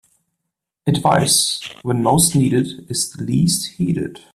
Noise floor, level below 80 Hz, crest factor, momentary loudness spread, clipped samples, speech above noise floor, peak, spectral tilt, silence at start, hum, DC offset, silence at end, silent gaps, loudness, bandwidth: -79 dBFS; -50 dBFS; 18 dB; 9 LU; under 0.1%; 62 dB; -2 dBFS; -4 dB/octave; 0.85 s; none; under 0.1%; 0.15 s; none; -17 LUFS; 15.5 kHz